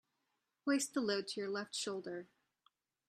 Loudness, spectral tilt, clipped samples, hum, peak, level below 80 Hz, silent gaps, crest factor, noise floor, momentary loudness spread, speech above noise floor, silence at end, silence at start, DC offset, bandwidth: -39 LUFS; -3 dB/octave; under 0.1%; none; -22 dBFS; -88 dBFS; none; 20 dB; -86 dBFS; 10 LU; 47 dB; 0.85 s; 0.65 s; under 0.1%; 13.5 kHz